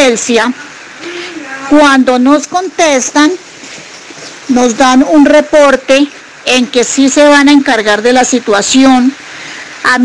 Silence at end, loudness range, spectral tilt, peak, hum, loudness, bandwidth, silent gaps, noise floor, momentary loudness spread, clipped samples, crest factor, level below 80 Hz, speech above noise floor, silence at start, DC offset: 0 s; 3 LU; -2 dB/octave; 0 dBFS; none; -7 LUFS; 10.5 kHz; none; -29 dBFS; 19 LU; under 0.1%; 8 dB; -44 dBFS; 22 dB; 0 s; under 0.1%